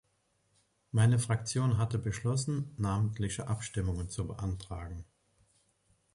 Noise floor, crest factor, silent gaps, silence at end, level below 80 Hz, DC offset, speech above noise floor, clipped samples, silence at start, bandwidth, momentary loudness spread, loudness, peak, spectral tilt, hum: -75 dBFS; 18 dB; none; 1.1 s; -50 dBFS; under 0.1%; 43 dB; under 0.1%; 0.95 s; 11.5 kHz; 12 LU; -33 LUFS; -16 dBFS; -6 dB/octave; none